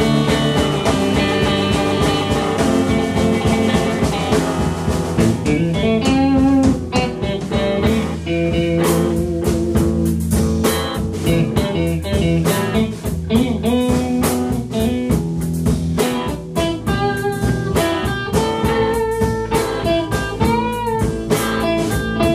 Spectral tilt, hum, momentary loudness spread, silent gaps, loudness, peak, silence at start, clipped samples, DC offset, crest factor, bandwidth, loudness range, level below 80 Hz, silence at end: -6 dB/octave; none; 4 LU; none; -18 LUFS; -2 dBFS; 0 s; under 0.1%; under 0.1%; 14 dB; 15.5 kHz; 2 LU; -30 dBFS; 0 s